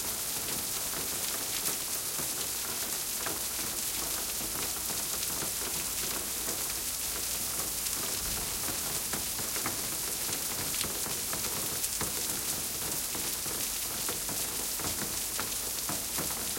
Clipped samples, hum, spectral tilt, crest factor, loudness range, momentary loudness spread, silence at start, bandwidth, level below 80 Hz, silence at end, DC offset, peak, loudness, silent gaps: under 0.1%; none; -0.5 dB/octave; 24 dB; 0 LU; 1 LU; 0 s; 17 kHz; -54 dBFS; 0 s; under 0.1%; -10 dBFS; -31 LUFS; none